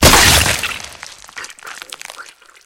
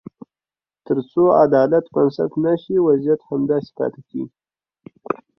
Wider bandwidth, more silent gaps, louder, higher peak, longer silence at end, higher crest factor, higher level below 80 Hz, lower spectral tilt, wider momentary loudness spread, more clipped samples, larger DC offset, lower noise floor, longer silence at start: first, over 20 kHz vs 5.8 kHz; neither; first, -10 LUFS vs -18 LUFS; about the same, 0 dBFS vs -2 dBFS; first, 0.45 s vs 0.25 s; about the same, 16 dB vs 18 dB; first, -28 dBFS vs -60 dBFS; second, -2 dB/octave vs -10.5 dB/octave; first, 24 LU vs 15 LU; neither; neither; second, -39 dBFS vs under -90 dBFS; second, 0 s vs 0.9 s